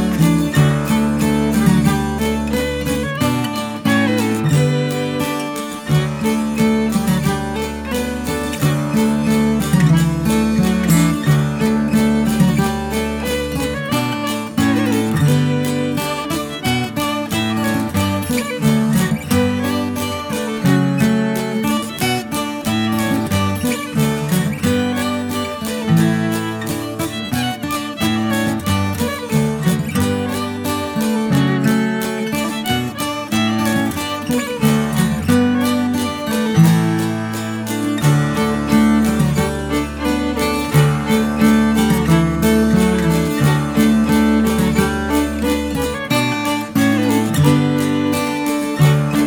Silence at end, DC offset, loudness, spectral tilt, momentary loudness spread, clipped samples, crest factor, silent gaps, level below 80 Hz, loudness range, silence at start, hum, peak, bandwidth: 0 s; under 0.1%; -17 LUFS; -5.5 dB/octave; 7 LU; under 0.1%; 16 dB; none; -36 dBFS; 4 LU; 0 s; none; 0 dBFS; over 20 kHz